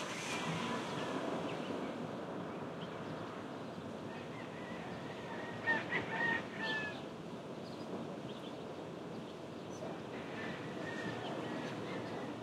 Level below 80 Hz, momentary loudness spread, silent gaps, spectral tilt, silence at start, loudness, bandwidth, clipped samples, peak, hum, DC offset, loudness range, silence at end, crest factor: -76 dBFS; 10 LU; none; -5 dB/octave; 0 s; -42 LUFS; 15.5 kHz; under 0.1%; -24 dBFS; none; under 0.1%; 6 LU; 0 s; 18 dB